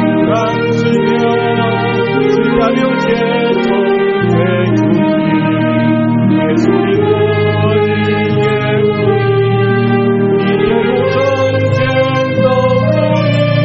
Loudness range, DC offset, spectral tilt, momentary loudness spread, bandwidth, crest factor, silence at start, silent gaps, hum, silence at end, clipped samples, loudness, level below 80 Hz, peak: 0 LU; 0.2%; -6 dB/octave; 1 LU; 7.4 kHz; 12 dB; 0 s; none; none; 0 s; under 0.1%; -12 LUFS; -42 dBFS; 0 dBFS